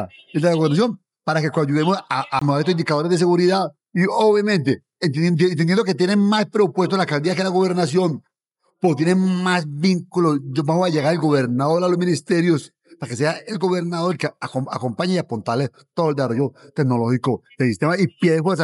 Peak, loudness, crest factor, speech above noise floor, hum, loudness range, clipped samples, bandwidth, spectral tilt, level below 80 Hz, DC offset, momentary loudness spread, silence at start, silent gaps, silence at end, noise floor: -4 dBFS; -20 LUFS; 14 dB; 51 dB; none; 4 LU; under 0.1%; 11.5 kHz; -6.5 dB/octave; -70 dBFS; under 0.1%; 7 LU; 0 s; none; 0 s; -70 dBFS